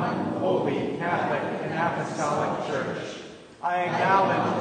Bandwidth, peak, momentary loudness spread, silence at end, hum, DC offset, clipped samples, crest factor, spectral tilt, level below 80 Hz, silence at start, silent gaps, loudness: 9.6 kHz; -8 dBFS; 11 LU; 0 s; none; under 0.1%; under 0.1%; 18 dB; -6 dB/octave; -66 dBFS; 0 s; none; -26 LUFS